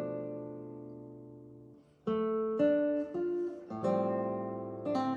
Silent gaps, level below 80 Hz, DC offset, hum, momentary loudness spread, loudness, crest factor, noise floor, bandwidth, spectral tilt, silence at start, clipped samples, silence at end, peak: none; -74 dBFS; under 0.1%; none; 20 LU; -34 LUFS; 16 dB; -57 dBFS; 7.4 kHz; -8.5 dB/octave; 0 s; under 0.1%; 0 s; -18 dBFS